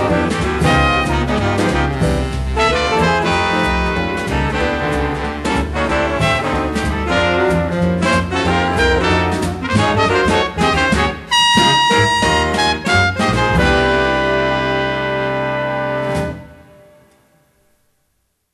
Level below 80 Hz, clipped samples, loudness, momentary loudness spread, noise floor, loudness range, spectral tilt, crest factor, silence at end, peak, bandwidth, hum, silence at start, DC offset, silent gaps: -28 dBFS; under 0.1%; -15 LUFS; 6 LU; -66 dBFS; 5 LU; -5 dB/octave; 16 dB; 2 s; 0 dBFS; 13 kHz; none; 0 s; under 0.1%; none